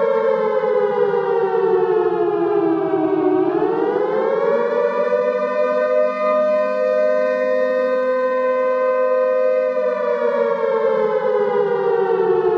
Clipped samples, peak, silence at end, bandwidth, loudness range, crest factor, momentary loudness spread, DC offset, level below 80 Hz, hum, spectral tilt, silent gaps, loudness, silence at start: under 0.1%; -6 dBFS; 0 s; 6.4 kHz; 0 LU; 12 dB; 2 LU; under 0.1%; -68 dBFS; none; -7.5 dB/octave; none; -18 LUFS; 0 s